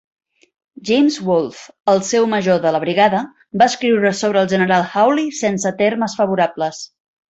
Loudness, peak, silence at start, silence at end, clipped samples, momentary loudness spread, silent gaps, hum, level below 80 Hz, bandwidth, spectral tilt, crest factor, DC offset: -16 LUFS; -2 dBFS; 0.8 s; 0.45 s; under 0.1%; 9 LU; 1.80-1.84 s; none; -60 dBFS; 8.2 kHz; -4.5 dB/octave; 16 dB; under 0.1%